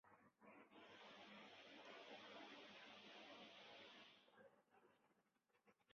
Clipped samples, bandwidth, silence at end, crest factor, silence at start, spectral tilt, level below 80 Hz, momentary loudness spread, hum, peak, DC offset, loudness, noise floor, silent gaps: under 0.1%; 6.8 kHz; 0 s; 16 dB; 0.05 s; -0.5 dB/octave; under -90 dBFS; 7 LU; none; -48 dBFS; under 0.1%; -62 LUFS; -85 dBFS; none